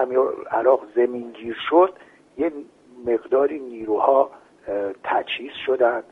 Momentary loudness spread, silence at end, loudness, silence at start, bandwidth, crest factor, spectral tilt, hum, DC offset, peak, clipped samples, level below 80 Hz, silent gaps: 13 LU; 0.1 s; -22 LUFS; 0 s; 4 kHz; 18 dB; -6 dB/octave; none; under 0.1%; -4 dBFS; under 0.1%; -64 dBFS; none